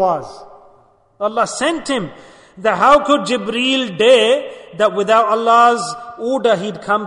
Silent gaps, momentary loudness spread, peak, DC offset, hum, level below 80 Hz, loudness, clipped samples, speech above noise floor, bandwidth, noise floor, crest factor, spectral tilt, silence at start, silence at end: none; 13 LU; 0 dBFS; under 0.1%; none; -54 dBFS; -15 LUFS; under 0.1%; 36 dB; 11 kHz; -52 dBFS; 14 dB; -3.5 dB/octave; 0 s; 0 s